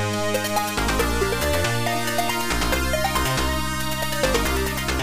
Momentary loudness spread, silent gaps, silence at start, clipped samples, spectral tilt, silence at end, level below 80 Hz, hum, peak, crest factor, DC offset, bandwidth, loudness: 2 LU; none; 0 s; under 0.1%; -3.5 dB/octave; 0 s; -32 dBFS; none; -8 dBFS; 14 dB; under 0.1%; 15.5 kHz; -22 LUFS